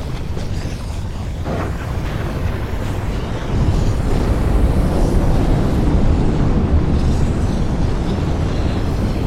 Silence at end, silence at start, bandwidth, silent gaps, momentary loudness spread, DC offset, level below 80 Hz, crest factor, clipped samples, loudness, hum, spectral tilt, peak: 0 s; 0 s; 13.5 kHz; none; 8 LU; 0.6%; -20 dBFS; 14 dB; under 0.1%; -19 LUFS; none; -7.5 dB/octave; -2 dBFS